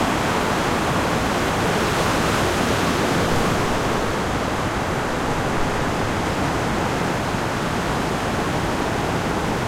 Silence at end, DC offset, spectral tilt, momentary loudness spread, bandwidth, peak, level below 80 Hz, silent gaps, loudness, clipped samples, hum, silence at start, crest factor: 0 s; under 0.1%; -4.5 dB/octave; 3 LU; 16.5 kHz; -8 dBFS; -36 dBFS; none; -21 LUFS; under 0.1%; none; 0 s; 14 dB